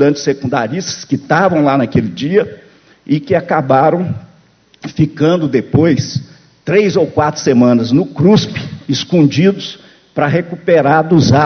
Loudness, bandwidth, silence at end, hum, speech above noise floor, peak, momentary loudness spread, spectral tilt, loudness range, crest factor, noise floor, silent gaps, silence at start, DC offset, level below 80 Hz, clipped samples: -13 LUFS; 6.6 kHz; 0 s; none; 37 dB; 0 dBFS; 12 LU; -6.5 dB/octave; 3 LU; 12 dB; -49 dBFS; none; 0 s; under 0.1%; -44 dBFS; under 0.1%